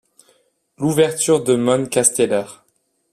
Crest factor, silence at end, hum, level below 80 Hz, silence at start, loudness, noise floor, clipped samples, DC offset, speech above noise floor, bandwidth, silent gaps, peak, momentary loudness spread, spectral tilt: 20 dB; 0.6 s; none; -60 dBFS; 0.8 s; -17 LUFS; -66 dBFS; under 0.1%; under 0.1%; 49 dB; 14.5 kHz; none; 0 dBFS; 8 LU; -4 dB/octave